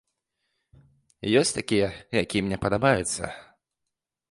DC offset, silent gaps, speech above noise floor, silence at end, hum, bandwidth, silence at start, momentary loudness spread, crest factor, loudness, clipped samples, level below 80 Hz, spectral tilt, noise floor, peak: under 0.1%; none; 60 dB; 0.9 s; none; 11.5 kHz; 1.25 s; 11 LU; 20 dB; -25 LUFS; under 0.1%; -52 dBFS; -4.5 dB/octave; -84 dBFS; -8 dBFS